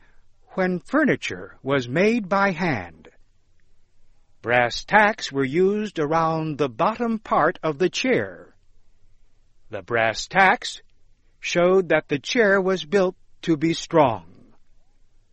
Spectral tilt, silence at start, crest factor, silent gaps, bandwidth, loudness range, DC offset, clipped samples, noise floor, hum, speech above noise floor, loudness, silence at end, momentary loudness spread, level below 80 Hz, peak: -5 dB/octave; 0.55 s; 20 dB; none; 8.4 kHz; 4 LU; under 0.1%; under 0.1%; -54 dBFS; none; 33 dB; -21 LUFS; 1.05 s; 14 LU; -52 dBFS; -2 dBFS